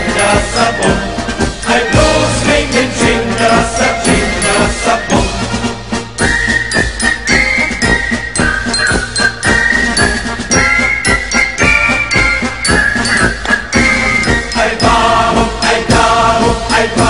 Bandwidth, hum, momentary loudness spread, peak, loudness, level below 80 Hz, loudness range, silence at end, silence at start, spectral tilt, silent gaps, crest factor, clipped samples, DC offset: 11 kHz; none; 4 LU; 0 dBFS; -11 LUFS; -24 dBFS; 2 LU; 0 s; 0 s; -3.5 dB/octave; none; 12 dB; under 0.1%; 1%